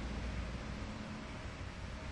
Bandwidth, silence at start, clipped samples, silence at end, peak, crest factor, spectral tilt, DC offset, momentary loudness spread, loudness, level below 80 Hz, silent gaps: 11 kHz; 0 s; under 0.1%; 0 s; -30 dBFS; 12 dB; -5.5 dB/octave; under 0.1%; 4 LU; -45 LUFS; -46 dBFS; none